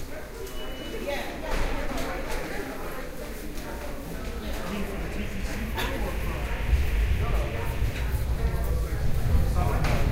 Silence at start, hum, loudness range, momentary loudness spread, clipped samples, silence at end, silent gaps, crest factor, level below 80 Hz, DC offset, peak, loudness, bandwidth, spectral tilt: 0 s; none; 6 LU; 10 LU; under 0.1%; 0 s; none; 16 dB; -30 dBFS; under 0.1%; -12 dBFS; -31 LUFS; 16 kHz; -5.5 dB/octave